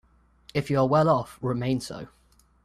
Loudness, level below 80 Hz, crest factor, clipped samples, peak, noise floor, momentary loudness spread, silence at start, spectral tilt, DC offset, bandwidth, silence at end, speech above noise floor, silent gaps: -25 LUFS; -56 dBFS; 18 dB; under 0.1%; -8 dBFS; -56 dBFS; 17 LU; 0.55 s; -7 dB/octave; under 0.1%; 14 kHz; 0.6 s; 31 dB; none